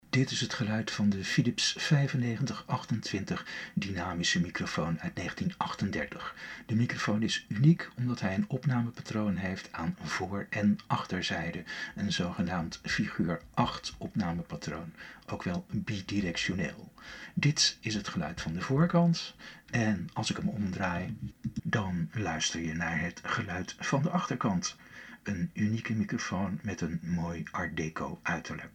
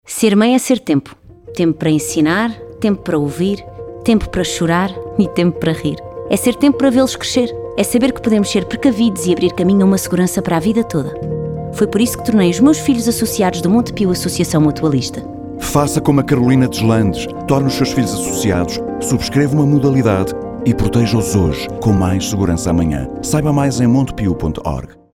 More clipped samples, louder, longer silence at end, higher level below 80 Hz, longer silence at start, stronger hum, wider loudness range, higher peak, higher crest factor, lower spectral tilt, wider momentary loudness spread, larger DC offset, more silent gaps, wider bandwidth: neither; second, -32 LUFS vs -15 LUFS; second, 0.05 s vs 0.25 s; second, -58 dBFS vs -34 dBFS; about the same, 0.15 s vs 0.05 s; neither; about the same, 4 LU vs 2 LU; second, -12 dBFS vs 0 dBFS; first, 20 dB vs 14 dB; about the same, -5 dB/octave vs -5.5 dB/octave; about the same, 10 LU vs 8 LU; neither; neither; second, 12 kHz vs 17 kHz